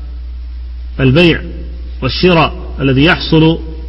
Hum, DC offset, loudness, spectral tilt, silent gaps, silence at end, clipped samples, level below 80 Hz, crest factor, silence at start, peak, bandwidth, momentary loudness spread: none; under 0.1%; -11 LUFS; -8 dB/octave; none; 0 s; 0.1%; -24 dBFS; 12 dB; 0 s; 0 dBFS; 6.2 kHz; 18 LU